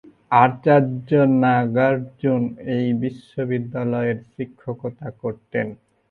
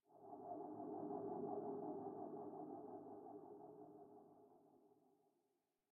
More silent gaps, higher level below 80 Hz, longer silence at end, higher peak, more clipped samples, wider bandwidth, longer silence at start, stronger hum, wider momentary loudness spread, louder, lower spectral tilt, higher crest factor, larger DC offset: neither; first, -60 dBFS vs under -90 dBFS; second, 0.35 s vs 0.75 s; first, 0 dBFS vs -34 dBFS; neither; first, 4.5 kHz vs 1.9 kHz; first, 0.3 s vs 0.1 s; neither; about the same, 14 LU vs 15 LU; first, -21 LUFS vs -52 LUFS; first, -10 dB/octave vs 1 dB/octave; about the same, 20 dB vs 20 dB; neither